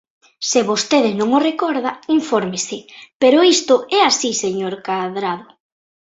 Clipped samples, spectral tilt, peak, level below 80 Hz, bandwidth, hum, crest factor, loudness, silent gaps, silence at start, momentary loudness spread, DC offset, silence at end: under 0.1%; -3 dB/octave; -2 dBFS; -64 dBFS; 8.2 kHz; none; 16 dB; -17 LUFS; 3.15-3.20 s; 0.4 s; 11 LU; under 0.1%; 0.7 s